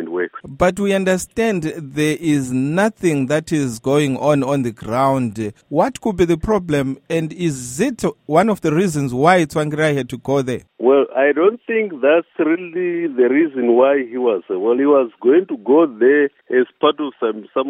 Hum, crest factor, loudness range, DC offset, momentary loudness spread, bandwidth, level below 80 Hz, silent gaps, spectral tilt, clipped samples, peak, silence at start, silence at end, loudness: none; 16 dB; 3 LU; under 0.1%; 8 LU; 16 kHz; -46 dBFS; none; -6 dB/octave; under 0.1%; 0 dBFS; 0 s; 0 s; -17 LUFS